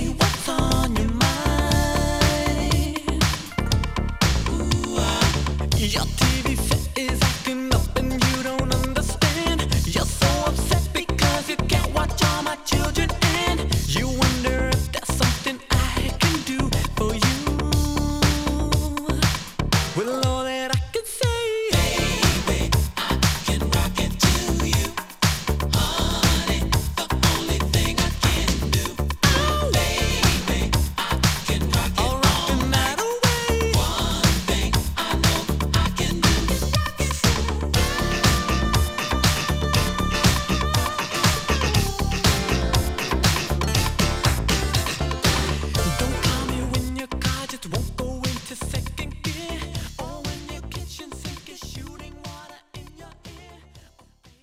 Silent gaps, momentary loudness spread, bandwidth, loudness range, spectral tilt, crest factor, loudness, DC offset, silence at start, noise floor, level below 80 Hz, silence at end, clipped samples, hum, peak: none; 8 LU; 16.5 kHz; 6 LU; -4 dB/octave; 20 dB; -22 LUFS; under 0.1%; 0 s; -53 dBFS; -28 dBFS; 0.65 s; under 0.1%; none; -2 dBFS